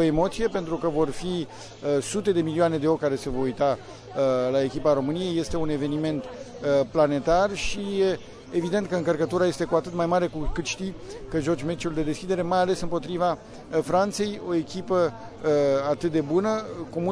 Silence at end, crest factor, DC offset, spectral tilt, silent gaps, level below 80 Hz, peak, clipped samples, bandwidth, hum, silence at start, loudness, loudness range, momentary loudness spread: 0 s; 16 dB; under 0.1%; -6 dB/octave; none; -44 dBFS; -8 dBFS; under 0.1%; 11 kHz; none; 0 s; -26 LUFS; 2 LU; 8 LU